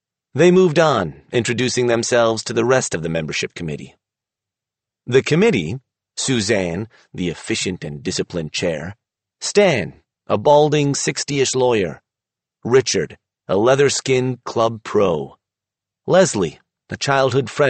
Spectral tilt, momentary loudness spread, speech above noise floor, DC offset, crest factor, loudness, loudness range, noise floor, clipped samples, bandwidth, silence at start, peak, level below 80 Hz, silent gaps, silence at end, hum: -4.5 dB/octave; 14 LU; 69 dB; under 0.1%; 16 dB; -18 LUFS; 4 LU; -86 dBFS; under 0.1%; 8.8 kHz; 0.35 s; -2 dBFS; -54 dBFS; none; 0 s; none